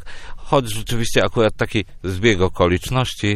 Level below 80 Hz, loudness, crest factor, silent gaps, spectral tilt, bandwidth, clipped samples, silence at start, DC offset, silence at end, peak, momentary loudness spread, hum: -34 dBFS; -19 LUFS; 18 dB; none; -5 dB/octave; 14.5 kHz; under 0.1%; 0 s; under 0.1%; 0 s; 0 dBFS; 8 LU; none